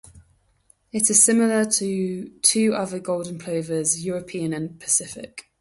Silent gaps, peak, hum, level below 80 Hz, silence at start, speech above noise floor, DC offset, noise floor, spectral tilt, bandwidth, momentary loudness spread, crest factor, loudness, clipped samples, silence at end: none; 0 dBFS; none; -62 dBFS; 0.15 s; 39 dB; under 0.1%; -61 dBFS; -3 dB/octave; 12 kHz; 14 LU; 24 dB; -21 LUFS; under 0.1%; 0.2 s